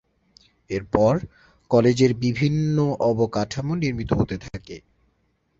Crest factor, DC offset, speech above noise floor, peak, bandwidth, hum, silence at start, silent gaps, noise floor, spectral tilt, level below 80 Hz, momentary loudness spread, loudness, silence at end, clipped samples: 20 dB; under 0.1%; 46 dB; -2 dBFS; 7.8 kHz; none; 0.7 s; none; -68 dBFS; -7 dB/octave; -46 dBFS; 17 LU; -22 LUFS; 0.8 s; under 0.1%